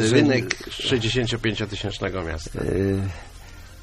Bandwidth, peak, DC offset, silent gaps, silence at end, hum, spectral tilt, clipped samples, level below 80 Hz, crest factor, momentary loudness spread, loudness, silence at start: 13 kHz; 0 dBFS; under 0.1%; none; 0 s; none; -5 dB/octave; under 0.1%; -40 dBFS; 24 dB; 17 LU; -24 LUFS; 0 s